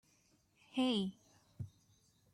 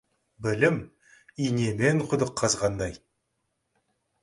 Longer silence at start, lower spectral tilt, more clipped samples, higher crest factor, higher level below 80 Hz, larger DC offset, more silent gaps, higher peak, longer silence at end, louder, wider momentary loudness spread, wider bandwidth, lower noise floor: first, 0.75 s vs 0.4 s; about the same, -5.5 dB/octave vs -5 dB/octave; neither; about the same, 18 dB vs 22 dB; second, -78 dBFS vs -54 dBFS; neither; neither; second, -26 dBFS vs -6 dBFS; second, 0.65 s vs 1.25 s; second, -38 LUFS vs -26 LUFS; first, 17 LU vs 10 LU; about the same, 12 kHz vs 11.5 kHz; second, -73 dBFS vs -78 dBFS